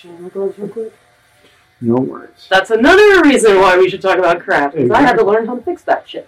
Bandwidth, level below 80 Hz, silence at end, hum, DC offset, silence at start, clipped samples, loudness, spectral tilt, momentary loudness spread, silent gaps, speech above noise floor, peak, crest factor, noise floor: 13.5 kHz; -44 dBFS; 0.05 s; none; under 0.1%; 0.1 s; under 0.1%; -12 LUFS; -4.5 dB/octave; 16 LU; none; 38 dB; -2 dBFS; 12 dB; -50 dBFS